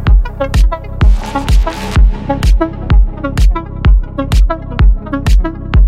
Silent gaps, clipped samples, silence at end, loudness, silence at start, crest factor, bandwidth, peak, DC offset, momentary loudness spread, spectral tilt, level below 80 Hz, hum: none; under 0.1%; 0 s; -14 LUFS; 0 s; 10 dB; 9.6 kHz; 0 dBFS; under 0.1%; 3 LU; -6.5 dB/octave; -10 dBFS; none